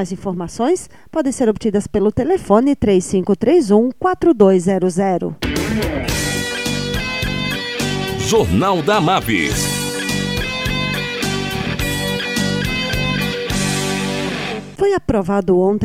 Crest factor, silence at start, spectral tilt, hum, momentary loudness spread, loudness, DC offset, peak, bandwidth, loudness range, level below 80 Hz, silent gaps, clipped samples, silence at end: 16 dB; 0 s; -5 dB/octave; none; 6 LU; -17 LUFS; under 0.1%; 0 dBFS; 16.5 kHz; 5 LU; -34 dBFS; none; under 0.1%; 0 s